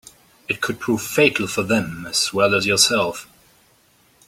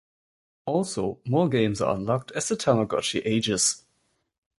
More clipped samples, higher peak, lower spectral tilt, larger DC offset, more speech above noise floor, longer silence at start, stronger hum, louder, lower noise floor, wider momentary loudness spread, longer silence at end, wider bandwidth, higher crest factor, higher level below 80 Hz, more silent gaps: neither; first, -2 dBFS vs -6 dBFS; about the same, -3 dB/octave vs -4 dB/octave; neither; second, 37 dB vs 47 dB; second, 0.5 s vs 0.65 s; neither; first, -19 LUFS vs -25 LUFS; second, -57 dBFS vs -72 dBFS; first, 10 LU vs 6 LU; first, 1.05 s vs 0.8 s; first, 16.5 kHz vs 12 kHz; about the same, 20 dB vs 20 dB; about the same, -56 dBFS vs -56 dBFS; neither